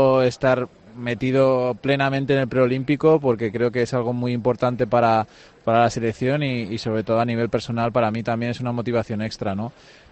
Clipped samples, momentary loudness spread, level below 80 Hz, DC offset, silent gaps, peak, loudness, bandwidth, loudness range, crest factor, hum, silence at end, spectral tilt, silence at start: under 0.1%; 9 LU; -54 dBFS; under 0.1%; none; -6 dBFS; -21 LUFS; 8.6 kHz; 3 LU; 16 dB; none; 0.4 s; -7 dB/octave; 0 s